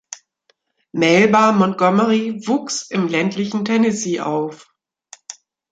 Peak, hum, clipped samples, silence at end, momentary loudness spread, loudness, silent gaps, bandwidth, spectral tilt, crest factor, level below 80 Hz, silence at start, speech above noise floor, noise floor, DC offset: -2 dBFS; none; under 0.1%; 0.4 s; 23 LU; -17 LUFS; none; 9.2 kHz; -5 dB/octave; 16 dB; -64 dBFS; 0.1 s; 47 dB; -64 dBFS; under 0.1%